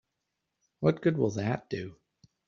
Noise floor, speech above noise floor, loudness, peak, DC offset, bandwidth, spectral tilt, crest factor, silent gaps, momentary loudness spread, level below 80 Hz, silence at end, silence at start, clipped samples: -84 dBFS; 55 dB; -30 LUFS; -10 dBFS; under 0.1%; 7.2 kHz; -7.5 dB/octave; 22 dB; none; 11 LU; -66 dBFS; 0.55 s; 0.8 s; under 0.1%